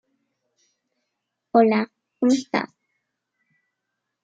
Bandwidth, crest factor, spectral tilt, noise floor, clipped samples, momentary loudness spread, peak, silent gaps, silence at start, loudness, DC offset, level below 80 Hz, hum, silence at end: 9.2 kHz; 22 dB; -5.5 dB/octave; -81 dBFS; under 0.1%; 13 LU; -4 dBFS; none; 1.55 s; -22 LUFS; under 0.1%; -78 dBFS; none; 1.6 s